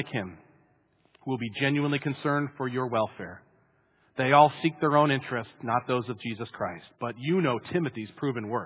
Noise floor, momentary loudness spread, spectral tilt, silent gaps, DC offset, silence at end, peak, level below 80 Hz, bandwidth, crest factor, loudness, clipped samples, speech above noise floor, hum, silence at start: -67 dBFS; 13 LU; -5 dB/octave; none; under 0.1%; 0 s; -6 dBFS; -66 dBFS; 4 kHz; 22 dB; -28 LUFS; under 0.1%; 39 dB; none; 0 s